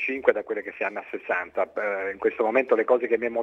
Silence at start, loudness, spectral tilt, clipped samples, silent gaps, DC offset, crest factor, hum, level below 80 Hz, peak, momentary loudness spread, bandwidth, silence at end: 0 s; -25 LUFS; -6.5 dB/octave; under 0.1%; none; under 0.1%; 20 dB; none; -68 dBFS; -6 dBFS; 8 LU; 6 kHz; 0 s